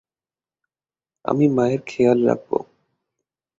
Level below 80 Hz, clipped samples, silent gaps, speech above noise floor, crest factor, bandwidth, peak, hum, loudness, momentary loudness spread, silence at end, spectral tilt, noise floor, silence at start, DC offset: -62 dBFS; under 0.1%; none; over 72 dB; 20 dB; 7.8 kHz; -4 dBFS; none; -20 LUFS; 10 LU; 0.95 s; -8 dB/octave; under -90 dBFS; 1.25 s; under 0.1%